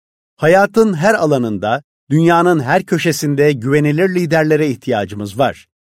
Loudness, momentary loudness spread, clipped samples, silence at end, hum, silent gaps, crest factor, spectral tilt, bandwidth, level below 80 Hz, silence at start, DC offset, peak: -14 LUFS; 8 LU; under 0.1%; 0.35 s; none; 1.84-2.07 s; 14 dB; -6 dB/octave; 16 kHz; -54 dBFS; 0.4 s; under 0.1%; 0 dBFS